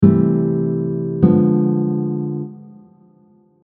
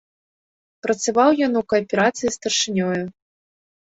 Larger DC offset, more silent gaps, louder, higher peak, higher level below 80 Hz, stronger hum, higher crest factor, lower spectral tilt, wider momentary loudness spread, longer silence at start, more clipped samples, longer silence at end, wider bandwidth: neither; neither; first, -17 LUFS vs -20 LUFS; first, 0 dBFS vs -4 dBFS; first, -52 dBFS vs -60 dBFS; neither; about the same, 18 dB vs 18 dB; first, -13 dB/octave vs -3.5 dB/octave; about the same, 11 LU vs 10 LU; second, 0 s vs 0.85 s; neither; first, 0.95 s vs 0.75 s; second, 2.6 kHz vs 8.2 kHz